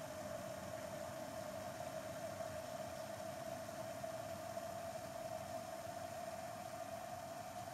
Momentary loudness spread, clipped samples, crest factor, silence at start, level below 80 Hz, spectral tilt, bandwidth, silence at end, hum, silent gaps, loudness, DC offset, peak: 2 LU; under 0.1%; 14 dB; 0 s; -76 dBFS; -4 dB/octave; 16 kHz; 0 s; none; none; -48 LUFS; under 0.1%; -34 dBFS